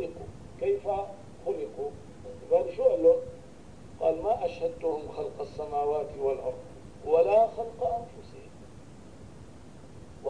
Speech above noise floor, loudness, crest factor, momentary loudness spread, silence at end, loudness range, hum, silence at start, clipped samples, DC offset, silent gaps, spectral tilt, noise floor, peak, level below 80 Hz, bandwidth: 23 dB; -29 LUFS; 18 dB; 26 LU; 0 s; 3 LU; none; 0 s; under 0.1%; 0.3%; none; -7 dB/octave; -49 dBFS; -12 dBFS; -56 dBFS; 10 kHz